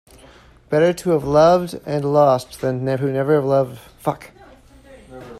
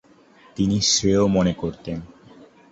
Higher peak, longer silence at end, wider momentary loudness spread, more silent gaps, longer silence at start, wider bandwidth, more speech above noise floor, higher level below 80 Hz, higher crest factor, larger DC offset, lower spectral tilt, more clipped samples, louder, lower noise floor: first, -2 dBFS vs -6 dBFS; second, 0 s vs 0.65 s; second, 12 LU vs 16 LU; neither; about the same, 0.7 s vs 0.6 s; first, 14 kHz vs 8 kHz; about the same, 29 dB vs 32 dB; second, -50 dBFS vs -44 dBFS; about the same, 18 dB vs 16 dB; neither; first, -7 dB/octave vs -4.5 dB/octave; neither; about the same, -18 LUFS vs -20 LUFS; second, -47 dBFS vs -52 dBFS